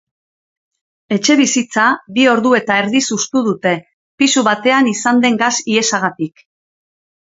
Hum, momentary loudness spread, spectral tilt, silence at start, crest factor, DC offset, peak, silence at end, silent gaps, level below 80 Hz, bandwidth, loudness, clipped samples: none; 6 LU; -3 dB/octave; 1.1 s; 16 dB; under 0.1%; 0 dBFS; 0.95 s; 3.93-4.18 s; -64 dBFS; 8 kHz; -14 LUFS; under 0.1%